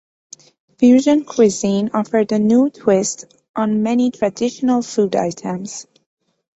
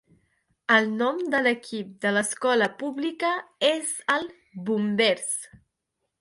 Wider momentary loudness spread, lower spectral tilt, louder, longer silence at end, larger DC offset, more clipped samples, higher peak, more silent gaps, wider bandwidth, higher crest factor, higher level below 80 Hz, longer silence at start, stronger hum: about the same, 12 LU vs 10 LU; first, -5.5 dB/octave vs -3 dB/octave; first, -17 LUFS vs -25 LUFS; about the same, 0.75 s vs 0.65 s; neither; neither; first, -2 dBFS vs -6 dBFS; first, 3.49-3.54 s vs none; second, 8.2 kHz vs 11.5 kHz; about the same, 16 dB vs 20 dB; first, -60 dBFS vs -72 dBFS; about the same, 0.8 s vs 0.7 s; neither